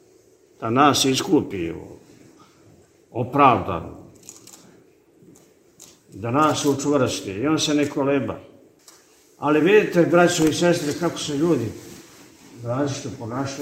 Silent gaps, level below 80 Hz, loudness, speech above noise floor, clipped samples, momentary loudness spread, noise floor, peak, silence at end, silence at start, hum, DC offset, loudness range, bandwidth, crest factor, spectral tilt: none; -56 dBFS; -20 LUFS; 34 dB; under 0.1%; 18 LU; -55 dBFS; 0 dBFS; 0 s; 0.6 s; none; under 0.1%; 5 LU; 16 kHz; 22 dB; -4.5 dB/octave